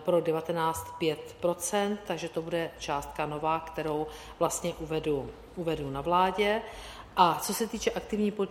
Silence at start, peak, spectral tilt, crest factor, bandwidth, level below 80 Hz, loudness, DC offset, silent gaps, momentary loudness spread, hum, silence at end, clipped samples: 0 s; -8 dBFS; -4.5 dB/octave; 22 dB; 16.5 kHz; -54 dBFS; -30 LUFS; under 0.1%; none; 9 LU; none; 0 s; under 0.1%